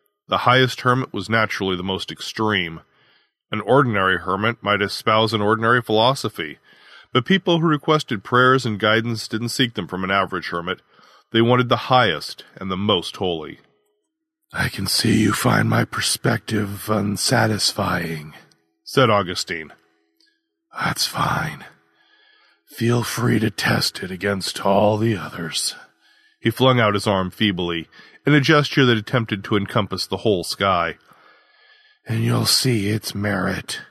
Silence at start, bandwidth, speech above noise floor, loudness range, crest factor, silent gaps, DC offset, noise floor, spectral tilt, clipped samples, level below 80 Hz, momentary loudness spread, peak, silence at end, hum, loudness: 0.3 s; 13.5 kHz; 57 dB; 4 LU; 20 dB; none; under 0.1%; -76 dBFS; -4.5 dB/octave; under 0.1%; -54 dBFS; 11 LU; 0 dBFS; 0.05 s; none; -20 LUFS